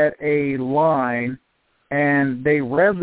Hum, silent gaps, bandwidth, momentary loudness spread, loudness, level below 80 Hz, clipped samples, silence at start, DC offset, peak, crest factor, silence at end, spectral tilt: none; none; 4 kHz; 8 LU; -20 LUFS; -58 dBFS; under 0.1%; 0 s; under 0.1%; -6 dBFS; 14 dB; 0 s; -11 dB/octave